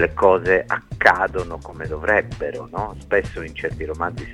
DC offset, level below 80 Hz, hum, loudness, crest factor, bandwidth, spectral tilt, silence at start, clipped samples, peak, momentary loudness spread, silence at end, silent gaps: under 0.1%; -38 dBFS; none; -21 LUFS; 20 dB; 12 kHz; -6 dB/octave; 0 s; under 0.1%; 0 dBFS; 13 LU; 0 s; none